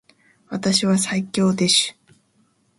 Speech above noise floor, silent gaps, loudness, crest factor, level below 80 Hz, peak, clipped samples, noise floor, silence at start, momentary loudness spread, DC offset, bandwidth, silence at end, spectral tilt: 43 dB; none; -19 LUFS; 18 dB; -62 dBFS; -4 dBFS; under 0.1%; -63 dBFS; 0.5 s; 10 LU; under 0.1%; 11.5 kHz; 0.85 s; -3.5 dB/octave